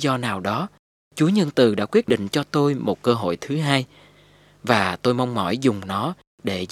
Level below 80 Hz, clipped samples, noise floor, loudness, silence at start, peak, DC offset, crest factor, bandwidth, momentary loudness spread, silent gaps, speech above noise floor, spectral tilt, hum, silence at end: -62 dBFS; under 0.1%; -53 dBFS; -22 LUFS; 0 s; 0 dBFS; under 0.1%; 22 dB; 15 kHz; 10 LU; 0.79-1.11 s, 6.27-6.38 s; 32 dB; -6 dB/octave; 50 Hz at -50 dBFS; 0.05 s